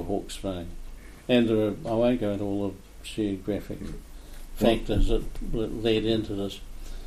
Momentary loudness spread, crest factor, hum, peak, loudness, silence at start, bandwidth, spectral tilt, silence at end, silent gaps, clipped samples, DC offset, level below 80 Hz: 19 LU; 20 dB; none; -8 dBFS; -28 LUFS; 0 s; 15 kHz; -6.5 dB/octave; 0 s; none; under 0.1%; under 0.1%; -34 dBFS